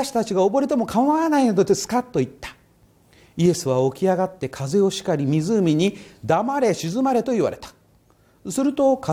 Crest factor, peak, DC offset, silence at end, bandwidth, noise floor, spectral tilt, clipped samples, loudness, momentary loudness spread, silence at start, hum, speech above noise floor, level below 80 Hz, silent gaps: 14 dB; -6 dBFS; under 0.1%; 0 s; 16.5 kHz; -57 dBFS; -6 dB/octave; under 0.1%; -21 LUFS; 11 LU; 0 s; none; 37 dB; -56 dBFS; none